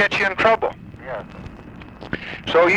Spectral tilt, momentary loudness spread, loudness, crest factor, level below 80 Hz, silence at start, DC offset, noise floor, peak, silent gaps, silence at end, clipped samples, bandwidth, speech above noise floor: -5 dB/octave; 21 LU; -21 LUFS; 18 dB; -46 dBFS; 0 s; under 0.1%; -38 dBFS; -4 dBFS; none; 0 s; under 0.1%; 9.8 kHz; 20 dB